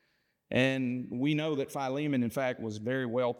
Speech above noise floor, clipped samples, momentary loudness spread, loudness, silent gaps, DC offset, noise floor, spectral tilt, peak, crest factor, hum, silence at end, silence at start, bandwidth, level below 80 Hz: 44 dB; under 0.1%; 5 LU; -31 LUFS; none; under 0.1%; -75 dBFS; -6.5 dB/octave; -14 dBFS; 18 dB; none; 0 s; 0.5 s; 17 kHz; -72 dBFS